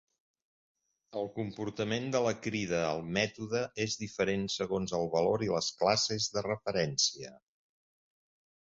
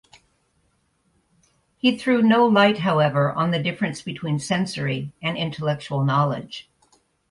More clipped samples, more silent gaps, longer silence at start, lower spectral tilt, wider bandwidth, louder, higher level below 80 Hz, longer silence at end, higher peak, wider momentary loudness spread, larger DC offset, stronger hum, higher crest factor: neither; neither; second, 1.1 s vs 1.85 s; second, -3.5 dB/octave vs -6 dB/octave; second, 7.6 kHz vs 11.5 kHz; second, -32 LUFS vs -21 LUFS; about the same, -64 dBFS vs -60 dBFS; first, 1.3 s vs 0.7 s; second, -12 dBFS vs -4 dBFS; about the same, 9 LU vs 11 LU; neither; neither; about the same, 22 dB vs 18 dB